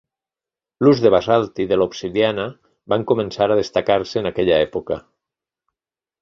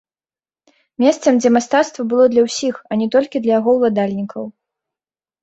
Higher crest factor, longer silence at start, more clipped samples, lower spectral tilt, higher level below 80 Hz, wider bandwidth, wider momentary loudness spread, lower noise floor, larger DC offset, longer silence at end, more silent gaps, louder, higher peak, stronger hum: about the same, 18 dB vs 16 dB; second, 0.8 s vs 1 s; neither; first, -6.5 dB/octave vs -5 dB/octave; first, -50 dBFS vs -62 dBFS; second, 7.4 kHz vs 8.2 kHz; about the same, 10 LU vs 9 LU; about the same, -90 dBFS vs under -90 dBFS; neither; first, 1.25 s vs 0.9 s; neither; second, -19 LUFS vs -16 LUFS; about the same, -2 dBFS vs -2 dBFS; neither